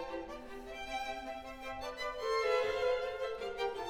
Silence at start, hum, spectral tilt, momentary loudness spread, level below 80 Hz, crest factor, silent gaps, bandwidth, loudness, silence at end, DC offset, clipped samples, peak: 0 s; none; -3 dB/octave; 13 LU; -58 dBFS; 16 dB; none; 16.5 kHz; -38 LUFS; 0 s; under 0.1%; under 0.1%; -20 dBFS